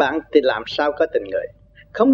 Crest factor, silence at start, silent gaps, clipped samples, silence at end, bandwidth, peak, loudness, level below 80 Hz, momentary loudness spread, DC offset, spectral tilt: 18 dB; 0 s; none; under 0.1%; 0 s; 6.8 kHz; 0 dBFS; -20 LUFS; -52 dBFS; 13 LU; under 0.1%; -5.5 dB/octave